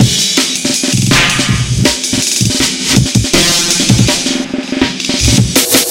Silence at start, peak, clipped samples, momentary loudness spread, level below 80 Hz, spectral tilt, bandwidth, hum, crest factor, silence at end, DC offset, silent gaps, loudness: 0 s; 0 dBFS; 0.4%; 5 LU; -28 dBFS; -3 dB/octave; 17.5 kHz; none; 12 dB; 0 s; under 0.1%; none; -10 LUFS